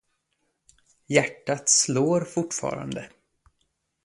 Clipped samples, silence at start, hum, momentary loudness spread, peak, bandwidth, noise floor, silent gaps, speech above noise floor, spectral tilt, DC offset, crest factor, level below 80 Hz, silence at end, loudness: under 0.1%; 1.1 s; none; 14 LU; -4 dBFS; 11.5 kHz; -75 dBFS; none; 50 dB; -3 dB/octave; under 0.1%; 24 dB; -64 dBFS; 1 s; -24 LUFS